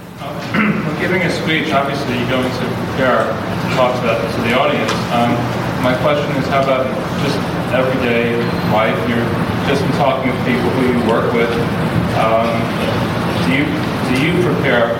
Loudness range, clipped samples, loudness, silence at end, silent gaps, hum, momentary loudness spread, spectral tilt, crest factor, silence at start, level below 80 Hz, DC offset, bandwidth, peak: 1 LU; under 0.1%; -16 LUFS; 0 s; none; none; 4 LU; -6 dB/octave; 12 dB; 0 s; -40 dBFS; under 0.1%; 16.5 kHz; -2 dBFS